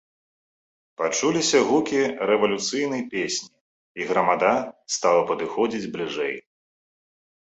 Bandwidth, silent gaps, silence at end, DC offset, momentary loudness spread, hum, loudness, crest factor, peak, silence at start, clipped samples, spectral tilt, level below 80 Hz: 8.2 kHz; 3.61-3.95 s; 1.05 s; under 0.1%; 10 LU; none; -23 LUFS; 18 dB; -6 dBFS; 1 s; under 0.1%; -3 dB/octave; -66 dBFS